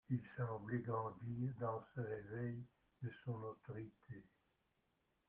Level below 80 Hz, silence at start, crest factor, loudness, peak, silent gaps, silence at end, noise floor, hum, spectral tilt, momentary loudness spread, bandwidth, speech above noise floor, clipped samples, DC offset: -76 dBFS; 0.1 s; 18 dB; -47 LUFS; -28 dBFS; none; 1.05 s; -84 dBFS; none; -9 dB/octave; 12 LU; 3.6 kHz; 38 dB; under 0.1%; under 0.1%